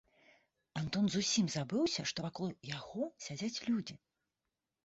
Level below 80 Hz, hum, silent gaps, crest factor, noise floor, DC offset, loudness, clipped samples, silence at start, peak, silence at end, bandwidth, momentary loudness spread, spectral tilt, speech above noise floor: -72 dBFS; none; none; 16 dB; -89 dBFS; under 0.1%; -37 LUFS; under 0.1%; 0.75 s; -22 dBFS; 0.9 s; 8 kHz; 11 LU; -4.5 dB/octave; 53 dB